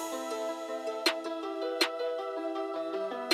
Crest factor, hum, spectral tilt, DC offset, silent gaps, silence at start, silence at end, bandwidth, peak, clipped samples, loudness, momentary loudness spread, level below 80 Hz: 22 dB; none; -1 dB/octave; under 0.1%; none; 0 s; 0 s; 16 kHz; -12 dBFS; under 0.1%; -33 LUFS; 6 LU; -84 dBFS